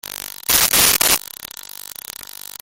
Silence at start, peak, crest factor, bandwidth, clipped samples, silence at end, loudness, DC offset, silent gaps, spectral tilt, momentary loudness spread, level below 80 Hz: 0.1 s; 0 dBFS; 20 dB; over 20 kHz; under 0.1%; 0.4 s; -14 LUFS; under 0.1%; none; 0.5 dB/octave; 20 LU; -46 dBFS